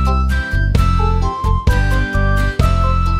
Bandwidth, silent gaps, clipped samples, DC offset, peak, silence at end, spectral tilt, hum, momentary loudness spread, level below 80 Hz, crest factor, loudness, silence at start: 13.5 kHz; none; under 0.1%; under 0.1%; 0 dBFS; 0 s; -6.5 dB/octave; none; 3 LU; -16 dBFS; 14 dB; -16 LUFS; 0 s